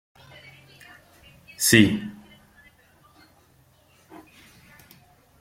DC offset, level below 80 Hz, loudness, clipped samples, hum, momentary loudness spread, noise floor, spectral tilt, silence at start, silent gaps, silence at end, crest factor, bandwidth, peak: under 0.1%; -58 dBFS; -19 LUFS; under 0.1%; none; 31 LU; -59 dBFS; -3.5 dB/octave; 1.6 s; none; 3.3 s; 26 dB; 16.5 kHz; -2 dBFS